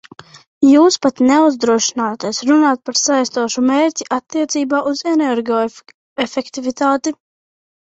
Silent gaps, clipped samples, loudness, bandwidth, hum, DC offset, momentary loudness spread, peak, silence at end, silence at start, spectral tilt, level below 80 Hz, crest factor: 5.94-6.16 s; under 0.1%; -15 LUFS; 8 kHz; none; under 0.1%; 10 LU; -2 dBFS; 0.8 s; 0.6 s; -2.5 dB/octave; -60 dBFS; 14 dB